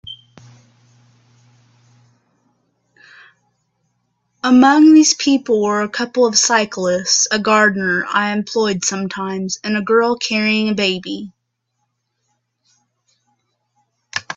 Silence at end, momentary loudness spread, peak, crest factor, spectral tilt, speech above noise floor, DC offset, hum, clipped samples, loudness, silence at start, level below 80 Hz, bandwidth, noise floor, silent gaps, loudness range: 0.05 s; 14 LU; 0 dBFS; 18 dB; -3 dB/octave; 57 dB; under 0.1%; none; under 0.1%; -15 LUFS; 0.05 s; -62 dBFS; 8.2 kHz; -72 dBFS; none; 10 LU